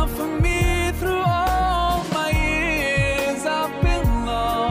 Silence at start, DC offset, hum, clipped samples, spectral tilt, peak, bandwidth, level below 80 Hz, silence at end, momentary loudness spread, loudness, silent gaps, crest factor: 0 s; under 0.1%; none; under 0.1%; -5 dB/octave; -8 dBFS; 16 kHz; -26 dBFS; 0 s; 3 LU; -21 LUFS; none; 12 dB